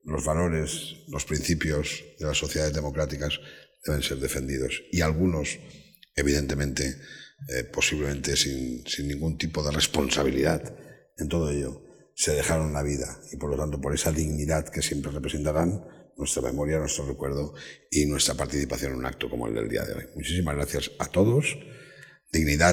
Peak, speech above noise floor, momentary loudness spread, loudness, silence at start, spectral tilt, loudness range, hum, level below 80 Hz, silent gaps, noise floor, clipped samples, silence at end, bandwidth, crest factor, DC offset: -6 dBFS; 23 dB; 11 LU; -27 LUFS; 0.05 s; -4 dB/octave; 2 LU; none; -40 dBFS; none; -51 dBFS; under 0.1%; 0 s; 18.5 kHz; 22 dB; under 0.1%